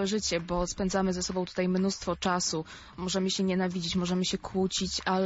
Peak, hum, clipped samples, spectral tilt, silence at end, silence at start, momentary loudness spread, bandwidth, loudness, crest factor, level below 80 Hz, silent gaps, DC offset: -14 dBFS; none; under 0.1%; -4.5 dB/octave; 0 s; 0 s; 4 LU; 8 kHz; -30 LUFS; 16 dB; -50 dBFS; none; under 0.1%